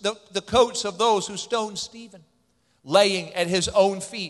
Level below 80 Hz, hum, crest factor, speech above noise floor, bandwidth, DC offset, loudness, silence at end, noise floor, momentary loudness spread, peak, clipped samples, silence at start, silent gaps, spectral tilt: -52 dBFS; none; 20 dB; 43 dB; 12.5 kHz; under 0.1%; -23 LUFS; 0 s; -67 dBFS; 11 LU; -4 dBFS; under 0.1%; 0.05 s; none; -3 dB/octave